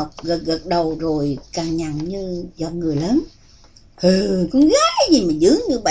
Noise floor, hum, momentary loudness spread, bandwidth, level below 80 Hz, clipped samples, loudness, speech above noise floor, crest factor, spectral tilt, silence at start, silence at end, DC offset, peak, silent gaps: -47 dBFS; none; 11 LU; 8 kHz; -42 dBFS; under 0.1%; -18 LUFS; 29 dB; 16 dB; -5 dB/octave; 0 s; 0 s; under 0.1%; -2 dBFS; none